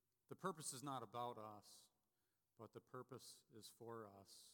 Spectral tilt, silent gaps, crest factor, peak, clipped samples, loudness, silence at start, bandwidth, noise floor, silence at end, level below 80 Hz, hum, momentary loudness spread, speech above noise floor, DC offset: -4 dB/octave; none; 22 dB; -34 dBFS; under 0.1%; -55 LUFS; 0.3 s; 18 kHz; under -90 dBFS; 0 s; under -90 dBFS; none; 14 LU; over 35 dB; under 0.1%